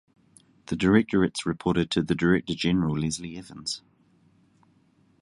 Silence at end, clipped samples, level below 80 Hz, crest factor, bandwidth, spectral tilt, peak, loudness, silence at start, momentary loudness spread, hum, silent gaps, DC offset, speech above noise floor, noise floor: 1.45 s; under 0.1%; -50 dBFS; 20 dB; 11.5 kHz; -5.5 dB/octave; -6 dBFS; -26 LUFS; 0.7 s; 13 LU; none; none; under 0.1%; 38 dB; -63 dBFS